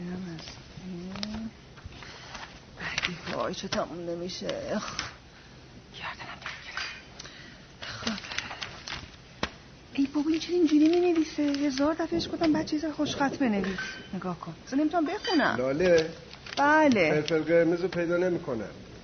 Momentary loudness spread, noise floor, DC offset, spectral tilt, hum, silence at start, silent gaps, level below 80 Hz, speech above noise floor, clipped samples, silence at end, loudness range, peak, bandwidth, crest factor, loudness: 19 LU; -50 dBFS; under 0.1%; -5 dB/octave; none; 0 s; none; -56 dBFS; 24 dB; under 0.1%; 0 s; 12 LU; -8 dBFS; 6.6 kHz; 22 dB; -28 LUFS